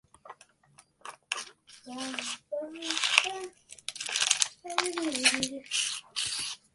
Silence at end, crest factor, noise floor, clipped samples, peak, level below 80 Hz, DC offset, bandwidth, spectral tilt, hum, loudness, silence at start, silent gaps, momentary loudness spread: 0.2 s; 32 dB; -62 dBFS; under 0.1%; -2 dBFS; -72 dBFS; under 0.1%; 12 kHz; 0.5 dB/octave; none; -29 LUFS; 0.25 s; none; 18 LU